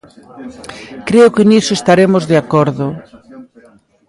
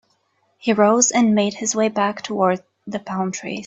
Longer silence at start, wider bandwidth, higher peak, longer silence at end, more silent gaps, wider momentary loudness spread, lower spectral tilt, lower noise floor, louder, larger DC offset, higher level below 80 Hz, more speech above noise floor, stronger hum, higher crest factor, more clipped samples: second, 0.35 s vs 0.65 s; first, 11.5 kHz vs 8.2 kHz; about the same, 0 dBFS vs -2 dBFS; first, 0.65 s vs 0 s; neither; first, 22 LU vs 13 LU; first, -6 dB/octave vs -4 dB/octave; second, -47 dBFS vs -65 dBFS; first, -11 LUFS vs -19 LUFS; neither; first, -50 dBFS vs -64 dBFS; second, 34 dB vs 46 dB; neither; about the same, 14 dB vs 18 dB; neither